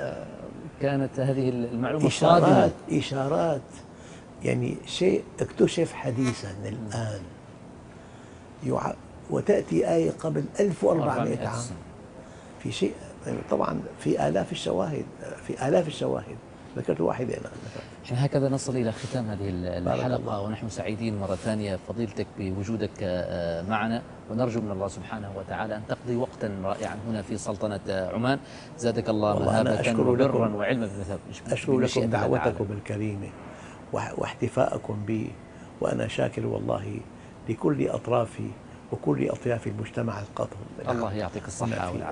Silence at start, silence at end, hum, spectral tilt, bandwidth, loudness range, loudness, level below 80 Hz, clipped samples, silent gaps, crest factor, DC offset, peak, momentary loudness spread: 0 s; 0 s; none; -6.5 dB/octave; 10.5 kHz; 7 LU; -28 LUFS; -54 dBFS; under 0.1%; none; 24 dB; under 0.1%; -4 dBFS; 15 LU